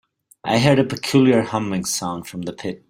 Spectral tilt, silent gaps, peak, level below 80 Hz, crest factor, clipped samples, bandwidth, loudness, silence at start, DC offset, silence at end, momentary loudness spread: -5 dB/octave; none; 0 dBFS; -54 dBFS; 20 dB; under 0.1%; 16 kHz; -19 LUFS; 0.45 s; under 0.1%; 0.15 s; 13 LU